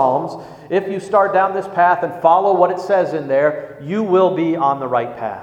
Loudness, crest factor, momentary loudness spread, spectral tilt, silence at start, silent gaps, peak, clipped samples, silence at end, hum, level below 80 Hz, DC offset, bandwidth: -17 LUFS; 16 dB; 8 LU; -7 dB/octave; 0 s; none; 0 dBFS; under 0.1%; 0 s; none; -62 dBFS; under 0.1%; 9.2 kHz